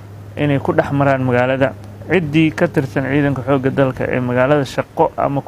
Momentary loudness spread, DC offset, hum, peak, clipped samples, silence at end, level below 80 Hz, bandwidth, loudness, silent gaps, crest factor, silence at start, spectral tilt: 5 LU; under 0.1%; none; 0 dBFS; under 0.1%; 0 s; -44 dBFS; 14 kHz; -16 LUFS; none; 16 dB; 0 s; -7.5 dB/octave